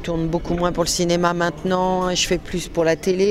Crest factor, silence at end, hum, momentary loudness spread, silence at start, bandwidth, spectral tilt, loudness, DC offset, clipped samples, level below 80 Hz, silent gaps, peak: 16 dB; 0 s; none; 4 LU; 0 s; 15.5 kHz; -4.5 dB/octave; -20 LUFS; under 0.1%; under 0.1%; -36 dBFS; none; -4 dBFS